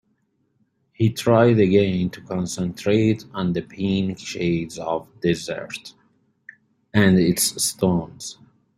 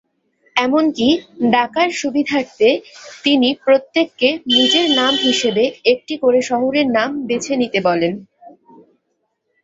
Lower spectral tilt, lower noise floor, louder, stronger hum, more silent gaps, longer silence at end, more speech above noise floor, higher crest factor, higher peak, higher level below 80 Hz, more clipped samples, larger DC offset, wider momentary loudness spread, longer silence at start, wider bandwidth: first, -5.5 dB/octave vs -3.5 dB/octave; about the same, -68 dBFS vs -70 dBFS; second, -21 LUFS vs -16 LUFS; neither; neither; second, 0.45 s vs 1.15 s; second, 47 dB vs 54 dB; about the same, 20 dB vs 16 dB; about the same, -2 dBFS vs -2 dBFS; about the same, -54 dBFS vs -58 dBFS; neither; neither; first, 12 LU vs 6 LU; first, 1 s vs 0.55 s; first, 16 kHz vs 8 kHz